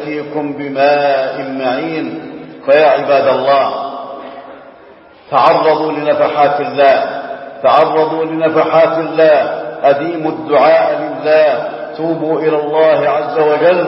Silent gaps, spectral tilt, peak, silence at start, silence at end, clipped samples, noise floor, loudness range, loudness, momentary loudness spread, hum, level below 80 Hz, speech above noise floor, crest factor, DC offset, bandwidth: none; -8 dB/octave; 0 dBFS; 0 s; 0 s; under 0.1%; -40 dBFS; 3 LU; -12 LUFS; 12 LU; none; -60 dBFS; 28 dB; 12 dB; under 0.1%; 5.8 kHz